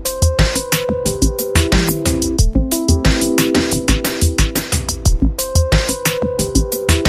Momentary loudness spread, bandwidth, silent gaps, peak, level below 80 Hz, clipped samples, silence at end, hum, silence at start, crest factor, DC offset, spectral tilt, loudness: 3 LU; 16 kHz; none; 0 dBFS; -20 dBFS; under 0.1%; 0 s; none; 0 s; 16 dB; under 0.1%; -4.5 dB/octave; -16 LUFS